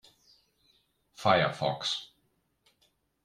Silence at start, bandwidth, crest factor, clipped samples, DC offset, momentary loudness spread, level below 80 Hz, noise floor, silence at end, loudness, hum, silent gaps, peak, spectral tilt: 1.2 s; 14 kHz; 24 dB; under 0.1%; under 0.1%; 11 LU; -68 dBFS; -74 dBFS; 1.2 s; -29 LUFS; none; none; -10 dBFS; -4.5 dB/octave